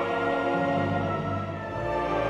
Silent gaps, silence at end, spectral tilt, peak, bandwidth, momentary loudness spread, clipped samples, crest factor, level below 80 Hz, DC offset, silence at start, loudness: none; 0 s; -7.5 dB/octave; -14 dBFS; 11 kHz; 6 LU; under 0.1%; 12 dB; -48 dBFS; under 0.1%; 0 s; -28 LUFS